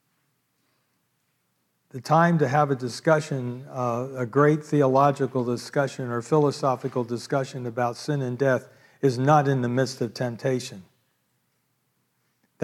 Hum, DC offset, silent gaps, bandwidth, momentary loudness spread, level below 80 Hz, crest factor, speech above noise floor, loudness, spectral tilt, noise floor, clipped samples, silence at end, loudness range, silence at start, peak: none; under 0.1%; none; 13.5 kHz; 10 LU; -76 dBFS; 18 dB; 49 dB; -24 LUFS; -6.5 dB/octave; -73 dBFS; under 0.1%; 1.8 s; 3 LU; 1.95 s; -6 dBFS